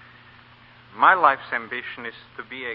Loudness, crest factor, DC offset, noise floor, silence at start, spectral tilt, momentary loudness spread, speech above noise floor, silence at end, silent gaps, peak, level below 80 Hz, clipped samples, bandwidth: -20 LUFS; 24 dB; under 0.1%; -50 dBFS; 0.95 s; -7.5 dB/octave; 20 LU; 28 dB; 0 s; none; -2 dBFS; -66 dBFS; under 0.1%; 5.4 kHz